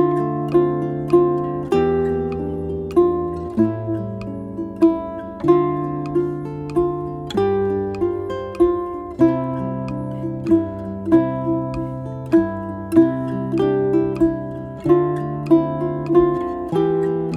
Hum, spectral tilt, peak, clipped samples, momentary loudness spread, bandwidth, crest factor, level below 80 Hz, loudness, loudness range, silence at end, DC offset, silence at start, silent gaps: none; -9 dB/octave; -2 dBFS; under 0.1%; 10 LU; 5.4 kHz; 18 dB; -44 dBFS; -20 LUFS; 3 LU; 0 s; under 0.1%; 0 s; none